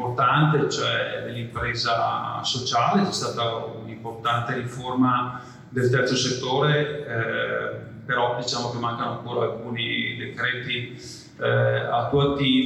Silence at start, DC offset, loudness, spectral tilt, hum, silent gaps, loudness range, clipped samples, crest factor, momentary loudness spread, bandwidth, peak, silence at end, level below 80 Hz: 0 s; under 0.1%; -24 LUFS; -5 dB/octave; none; none; 3 LU; under 0.1%; 16 dB; 11 LU; 12 kHz; -8 dBFS; 0 s; -54 dBFS